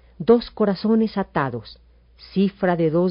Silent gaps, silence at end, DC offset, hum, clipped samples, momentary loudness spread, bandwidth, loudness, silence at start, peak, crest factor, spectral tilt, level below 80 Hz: none; 0 s; under 0.1%; none; under 0.1%; 8 LU; 5.4 kHz; -21 LUFS; 0.2 s; -4 dBFS; 18 dB; -6.5 dB/octave; -50 dBFS